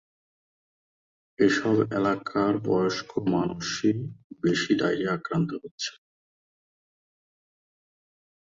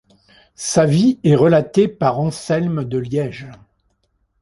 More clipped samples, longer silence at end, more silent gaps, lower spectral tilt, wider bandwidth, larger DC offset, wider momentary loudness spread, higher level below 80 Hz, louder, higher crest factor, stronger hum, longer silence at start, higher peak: neither; first, 2.65 s vs 0.85 s; first, 4.24-4.30 s, 5.71-5.78 s vs none; about the same, -5.5 dB/octave vs -6.5 dB/octave; second, 7.8 kHz vs 11.5 kHz; neither; about the same, 9 LU vs 10 LU; second, -62 dBFS vs -52 dBFS; second, -26 LUFS vs -17 LUFS; about the same, 20 dB vs 16 dB; neither; first, 1.4 s vs 0.6 s; second, -8 dBFS vs -2 dBFS